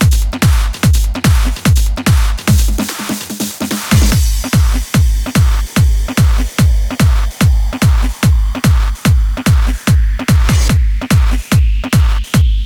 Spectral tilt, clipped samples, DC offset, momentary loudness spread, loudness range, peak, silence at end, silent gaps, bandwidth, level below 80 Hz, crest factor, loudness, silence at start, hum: -5 dB/octave; under 0.1%; under 0.1%; 2 LU; 1 LU; 0 dBFS; 0 s; none; 18.5 kHz; -14 dBFS; 10 dB; -13 LUFS; 0 s; none